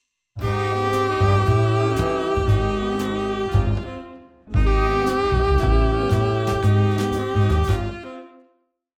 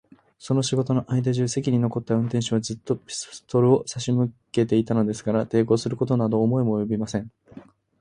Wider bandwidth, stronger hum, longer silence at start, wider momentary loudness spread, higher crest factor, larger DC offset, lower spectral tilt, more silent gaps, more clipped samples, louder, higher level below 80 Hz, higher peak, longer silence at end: first, 13.5 kHz vs 10.5 kHz; neither; about the same, 0.35 s vs 0.4 s; about the same, 9 LU vs 7 LU; about the same, 14 dB vs 18 dB; neither; about the same, -7 dB/octave vs -6.5 dB/octave; neither; neither; first, -21 LUFS vs -24 LUFS; first, -26 dBFS vs -58 dBFS; about the same, -6 dBFS vs -6 dBFS; first, 0.75 s vs 0.4 s